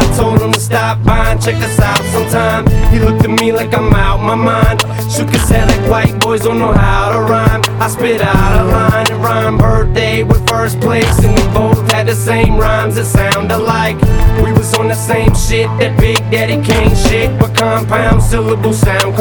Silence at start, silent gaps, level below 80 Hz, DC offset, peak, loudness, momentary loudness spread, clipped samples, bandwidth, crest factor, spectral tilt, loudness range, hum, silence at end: 0 s; none; -16 dBFS; under 0.1%; 0 dBFS; -11 LUFS; 3 LU; under 0.1%; 19.5 kHz; 10 dB; -5.5 dB/octave; 1 LU; none; 0 s